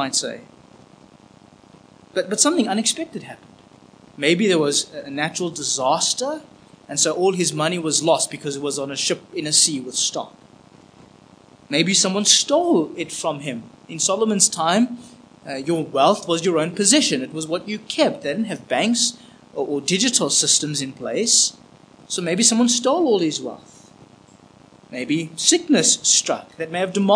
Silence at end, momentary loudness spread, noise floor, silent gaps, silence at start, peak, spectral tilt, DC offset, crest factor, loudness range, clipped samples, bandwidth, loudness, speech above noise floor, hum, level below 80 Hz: 0 s; 13 LU; -49 dBFS; none; 0 s; 0 dBFS; -2.5 dB/octave; under 0.1%; 22 dB; 4 LU; under 0.1%; 10.5 kHz; -19 LUFS; 29 dB; none; -68 dBFS